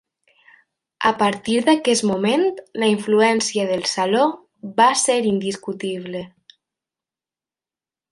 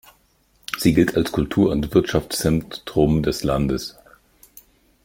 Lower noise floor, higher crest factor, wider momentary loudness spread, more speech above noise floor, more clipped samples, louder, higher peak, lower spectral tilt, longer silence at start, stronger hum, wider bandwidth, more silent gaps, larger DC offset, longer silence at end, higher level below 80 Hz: first, under -90 dBFS vs -61 dBFS; about the same, 20 dB vs 20 dB; about the same, 11 LU vs 9 LU; first, over 71 dB vs 41 dB; neither; about the same, -19 LUFS vs -20 LUFS; about the same, -2 dBFS vs -2 dBFS; second, -3.5 dB/octave vs -6 dB/octave; first, 1 s vs 0.7 s; neither; second, 11.5 kHz vs 17 kHz; neither; neither; first, 1.85 s vs 1.15 s; second, -66 dBFS vs -38 dBFS